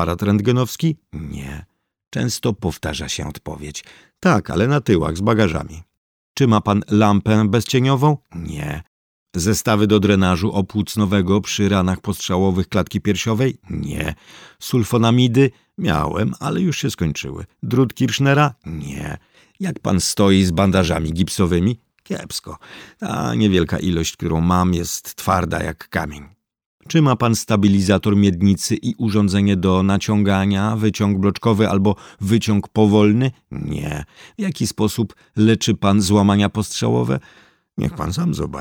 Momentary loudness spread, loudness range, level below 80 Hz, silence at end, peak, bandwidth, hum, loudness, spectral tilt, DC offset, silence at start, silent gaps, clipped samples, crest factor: 14 LU; 4 LU; -40 dBFS; 0 s; -2 dBFS; 19 kHz; none; -18 LUFS; -6 dB/octave; under 0.1%; 0 s; 2.07-2.11 s, 5.97-6.35 s, 8.87-9.26 s, 26.66-26.78 s; under 0.1%; 16 dB